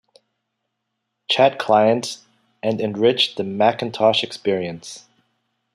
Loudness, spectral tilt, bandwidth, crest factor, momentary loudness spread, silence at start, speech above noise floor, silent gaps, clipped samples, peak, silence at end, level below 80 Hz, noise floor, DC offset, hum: -19 LUFS; -4.5 dB/octave; 13 kHz; 20 dB; 19 LU; 1.3 s; 58 dB; none; under 0.1%; -2 dBFS; 0.75 s; -68 dBFS; -77 dBFS; under 0.1%; none